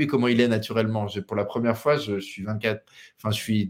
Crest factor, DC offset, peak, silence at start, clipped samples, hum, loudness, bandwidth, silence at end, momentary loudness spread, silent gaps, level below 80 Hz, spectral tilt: 20 dB; under 0.1%; -6 dBFS; 0 s; under 0.1%; none; -25 LUFS; 16.5 kHz; 0 s; 9 LU; none; -64 dBFS; -6 dB/octave